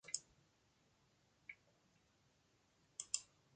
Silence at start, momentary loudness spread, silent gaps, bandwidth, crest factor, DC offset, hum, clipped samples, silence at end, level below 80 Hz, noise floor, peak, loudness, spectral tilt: 0.05 s; 16 LU; none; 9 kHz; 34 dB; under 0.1%; none; under 0.1%; 0.3 s; -88 dBFS; -78 dBFS; -22 dBFS; -47 LUFS; 1.5 dB/octave